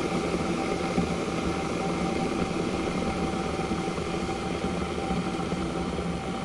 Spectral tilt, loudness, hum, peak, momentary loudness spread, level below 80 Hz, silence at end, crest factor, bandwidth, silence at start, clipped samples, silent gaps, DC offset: -5.5 dB/octave; -29 LUFS; none; -14 dBFS; 3 LU; -44 dBFS; 0 s; 14 dB; 11.5 kHz; 0 s; under 0.1%; none; under 0.1%